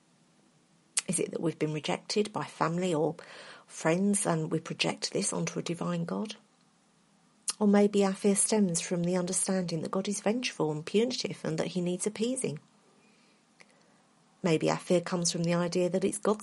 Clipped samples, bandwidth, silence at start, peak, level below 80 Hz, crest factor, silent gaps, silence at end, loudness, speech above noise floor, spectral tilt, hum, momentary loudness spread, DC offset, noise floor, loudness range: under 0.1%; 11.5 kHz; 0.95 s; -8 dBFS; -74 dBFS; 22 dB; none; 0 s; -30 LUFS; 36 dB; -4.5 dB/octave; none; 8 LU; under 0.1%; -66 dBFS; 6 LU